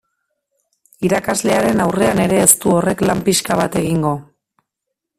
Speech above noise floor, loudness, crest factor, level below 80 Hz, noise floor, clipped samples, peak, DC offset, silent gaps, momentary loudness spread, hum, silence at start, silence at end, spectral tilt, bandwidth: 64 dB; -15 LUFS; 18 dB; -46 dBFS; -79 dBFS; under 0.1%; 0 dBFS; under 0.1%; none; 8 LU; none; 1 s; 0.95 s; -4 dB/octave; 16 kHz